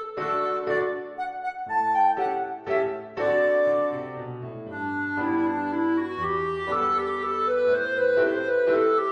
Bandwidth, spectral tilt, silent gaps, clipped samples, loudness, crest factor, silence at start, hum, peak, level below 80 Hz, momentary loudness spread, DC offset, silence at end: 9.4 kHz; -7 dB/octave; none; under 0.1%; -25 LUFS; 14 dB; 0 s; none; -12 dBFS; -60 dBFS; 11 LU; under 0.1%; 0 s